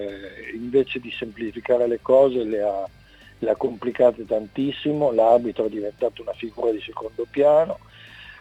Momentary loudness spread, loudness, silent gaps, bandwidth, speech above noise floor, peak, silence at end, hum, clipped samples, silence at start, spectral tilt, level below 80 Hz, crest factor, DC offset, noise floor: 15 LU; -22 LUFS; none; 8 kHz; 22 dB; -6 dBFS; 0.05 s; none; under 0.1%; 0 s; -7.5 dB/octave; -56 dBFS; 18 dB; under 0.1%; -44 dBFS